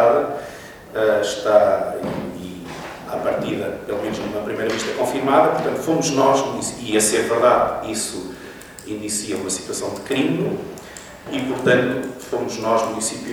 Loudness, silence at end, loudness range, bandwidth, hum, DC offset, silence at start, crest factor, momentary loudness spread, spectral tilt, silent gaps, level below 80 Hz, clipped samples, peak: -20 LUFS; 0 s; 7 LU; over 20 kHz; none; under 0.1%; 0 s; 20 dB; 16 LU; -4 dB/octave; none; -52 dBFS; under 0.1%; 0 dBFS